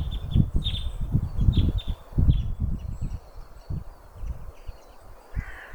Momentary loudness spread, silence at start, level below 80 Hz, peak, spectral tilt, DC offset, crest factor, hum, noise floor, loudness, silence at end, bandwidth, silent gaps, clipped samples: 21 LU; 0 s; -28 dBFS; -6 dBFS; -7.5 dB/octave; under 0.1%; 20 dB; none; -46 dBFS; -28 LUFS; 0 s; 19 kHz; none; under 0.1%